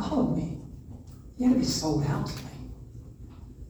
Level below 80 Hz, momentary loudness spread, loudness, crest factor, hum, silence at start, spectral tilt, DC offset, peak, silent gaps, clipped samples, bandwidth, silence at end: -46 dBFS; 22 LU; -28 LUFS; 16 dB; none; 0 s; -6 dB/octave; under 0.1%; -14 dBFS; none; under 0.1%; over 20 kHz; 0 s